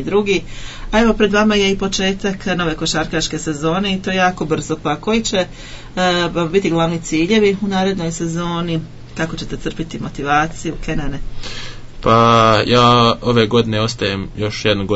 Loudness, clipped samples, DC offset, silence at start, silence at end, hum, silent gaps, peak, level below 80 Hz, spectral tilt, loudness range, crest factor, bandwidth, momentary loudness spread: -16 LUFS; under 0.1%; under 0.1%; 0 s; 0 s; none; none; 0 dBFS; -32 dBFS; -5 dB/octave; 7 LU; 16 dB; 8 kHz; 14 LU